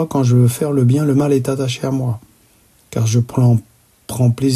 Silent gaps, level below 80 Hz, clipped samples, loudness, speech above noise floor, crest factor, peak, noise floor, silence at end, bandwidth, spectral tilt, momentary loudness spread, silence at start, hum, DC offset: none; -50 dBFS; under 0.1%; -16 LUFS; 38 dB; 12 dB; -4 dBFS; -52 dBFS; 0 s; 14 kHz; -7 dB/octave; 9 LU; 0 s; none; under 0.1%